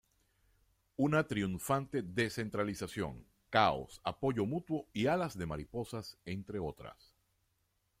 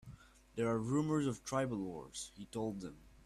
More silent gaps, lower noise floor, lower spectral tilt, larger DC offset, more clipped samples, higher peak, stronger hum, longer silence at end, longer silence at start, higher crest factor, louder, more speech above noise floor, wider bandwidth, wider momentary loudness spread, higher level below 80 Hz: neither; first, -79 dBFS vs -58 dBFS; about the same, -5.5 dB/octave vs -6 dB/octave; neither; neither; first, -14 dBFS vs -24 dBFS; neither; first, 1.05 s vs 0.05 s; first, 1 s vs 0.05 s; first, 22 dB vs 16 dB; first, -36 LUFS vs -39 LUFS; first, 43 dB vs 19 dB; first, 16 kHz vs 13.5 kHz; about the same, 12 LU vs 14 LU; about the same, -62 dBFS vs -64 dBFS